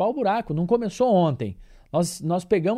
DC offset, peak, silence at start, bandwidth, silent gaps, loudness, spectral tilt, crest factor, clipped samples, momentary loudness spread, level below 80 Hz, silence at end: under 0.1%; -8 dBFS; 0 s; 15 kHz; none; -23 LUFS; -6.5 dB/octave; 14 dB; under 0.1%; 8 LU; -52 dBFS; 0 s